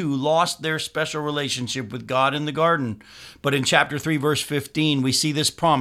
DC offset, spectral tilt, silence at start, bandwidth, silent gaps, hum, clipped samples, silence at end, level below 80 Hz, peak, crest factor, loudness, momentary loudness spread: under 0.1%; -4 dB/octave; 0 s; 16 kHz; none; none; under 0.1%; 0 s; -58 dBFS; 0 dBFS; 22 dB; -22 LUFS; 8 LU